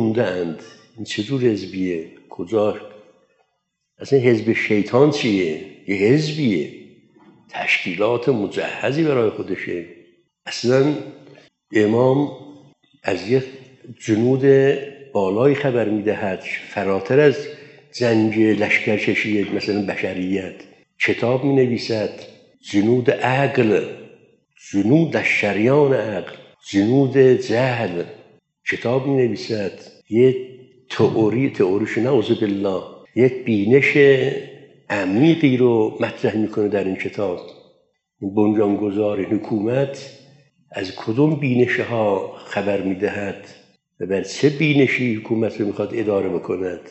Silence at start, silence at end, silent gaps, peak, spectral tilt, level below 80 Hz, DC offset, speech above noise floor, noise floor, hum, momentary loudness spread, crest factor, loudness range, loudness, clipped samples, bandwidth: 0 s; 0 s; none; 0 dBFS; -6.5 dB/octave; -70 dBFS; under 0.1%; 55 dB; -74 dBFS; none; 14 LU; 18 dB; 4 LU; -19 LUFS; under 0.1%; 8.2 kHz